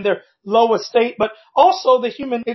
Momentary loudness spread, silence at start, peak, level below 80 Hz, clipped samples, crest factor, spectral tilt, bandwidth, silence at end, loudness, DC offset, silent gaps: 9 LU; 0 s; 0 dBFS; -62 dBFS; under 0.1%; 16 dB; -4.5 dB/octave; 6.2 kHz; 0 s; -17 LUFS; under 0.1%; none